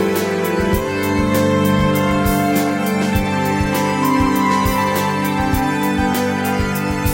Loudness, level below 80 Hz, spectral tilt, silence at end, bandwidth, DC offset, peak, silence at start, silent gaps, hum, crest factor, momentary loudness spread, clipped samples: -17 LUFS; -32 dBFS; -5.5 dB/octave; 0 s; 17 kHz; under 0.1%; -4 dBFS; 0 s; none; none; 14 dB; 3 LU; under 0.1%